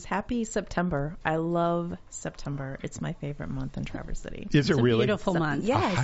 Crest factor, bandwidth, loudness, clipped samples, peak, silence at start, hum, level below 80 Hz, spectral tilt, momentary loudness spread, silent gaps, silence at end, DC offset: 18 dB; 8 kHz; -29 LUFS; under 0.1%; -10 dBFS; 0 s; none; -44 dBFS; -5.5 dB/octave; 13 LU; none; 0 s; under 0.1%